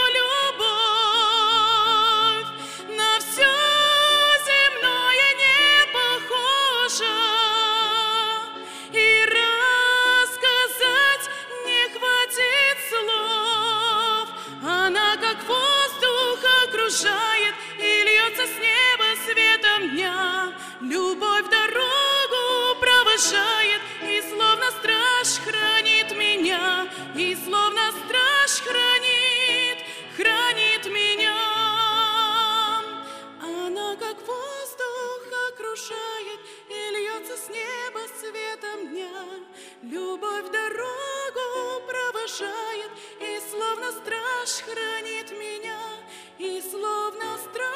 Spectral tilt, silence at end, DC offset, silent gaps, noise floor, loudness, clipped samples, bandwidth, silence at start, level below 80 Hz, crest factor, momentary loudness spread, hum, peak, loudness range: 0 dB/octave; 0 s; under 0.1%; none; -43 dBFS; -20 LUFS; under 0.1%; 15.5 kHz; 0 s; -68 dBFS; 18 dB; 16 LU; none; -4 dBFS; 13 LU